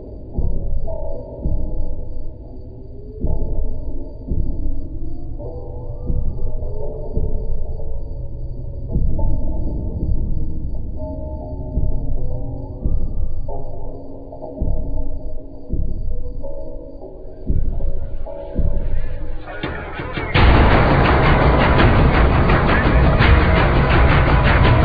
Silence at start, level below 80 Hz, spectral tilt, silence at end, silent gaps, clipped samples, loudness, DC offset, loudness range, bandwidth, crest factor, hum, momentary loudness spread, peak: 0 s; -20 dBFS; -9.5 dB/octave; 0 s; none; under 0.1%; -20 LUFS; under 0.1%; 15 LU; 5 kHz; 16 dB; none; 19 LU; -2 dBFS